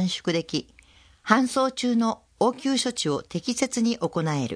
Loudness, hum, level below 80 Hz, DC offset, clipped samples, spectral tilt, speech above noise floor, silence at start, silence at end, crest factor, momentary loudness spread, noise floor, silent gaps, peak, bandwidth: -25 LUFS; none; -62 dBFS; under 0.1%; under 0.1%; -4.5 dB/octave; 29 dB; 0 s; 0 s; 22 dB; 7 LU; -54 dBFS; none; -2 dBFS; 10.5 kHz